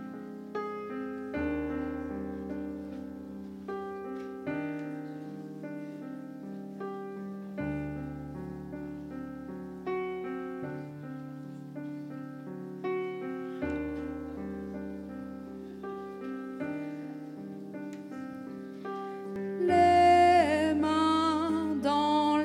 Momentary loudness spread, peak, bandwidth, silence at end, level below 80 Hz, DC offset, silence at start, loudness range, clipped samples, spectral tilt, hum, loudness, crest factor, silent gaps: 16 LU; -14 dBFS; 13.5 kHz; 0 s; -60 dBFS; under 0.1%; 0 s; 14 LU; under 0.1%; -6 dB/octave; none; -33 LUFS; 20 dB; none